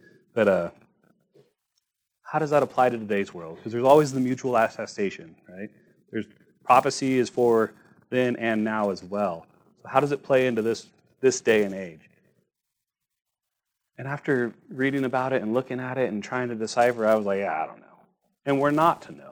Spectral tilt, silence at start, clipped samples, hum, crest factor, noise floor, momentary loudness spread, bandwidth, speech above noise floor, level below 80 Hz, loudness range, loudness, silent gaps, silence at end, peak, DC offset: -5.5 dB/octave; 0.35 s; under 0.1%; none; 22 dB; -84 dBFS; 15 LU; over 20 kHz; 59 dB; -70 dBFS; 5 LU; -25 LUFS; none; 0 s; -4 dBFS; under 0.1%